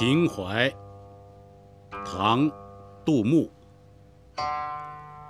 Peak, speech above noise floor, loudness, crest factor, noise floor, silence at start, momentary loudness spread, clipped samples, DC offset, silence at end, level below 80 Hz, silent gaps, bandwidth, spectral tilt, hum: -6 dBFS; 28 dB; -26 LUFS; 22 dB; -53 dBFS; 0 s; 22 LU; under 0.1%; under 0.1%; 0 s; -58 dBFS; none; 13.5 kHz; -6.5 dB/octave; none